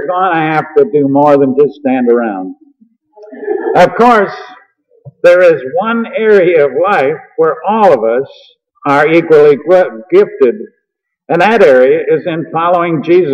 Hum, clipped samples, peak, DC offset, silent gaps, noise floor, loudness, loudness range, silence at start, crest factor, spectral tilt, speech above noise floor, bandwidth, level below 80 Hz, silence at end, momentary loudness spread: none; 0.3%; 0 dBFS; under 0.1%; none; -71 dBFS; -10 LUFS; 3 LU; 0 s; 10 dB; -7 dB/octave; 62 dB; 8.6 kHz; -54 dBFS; 0 s; 10 LU